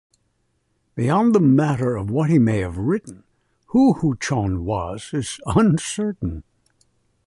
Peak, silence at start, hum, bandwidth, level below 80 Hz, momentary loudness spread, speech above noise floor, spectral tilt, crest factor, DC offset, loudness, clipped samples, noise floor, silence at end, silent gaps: -4 dBFS; 0.95 s; none; 11.5 kHz; -42 dBFS; 11 LU; 49 dB; -7 dB/octave; 18 dB; under 0.1%; -20 LUFS; under 0.1%; -68 dBFS; 0.85 s; none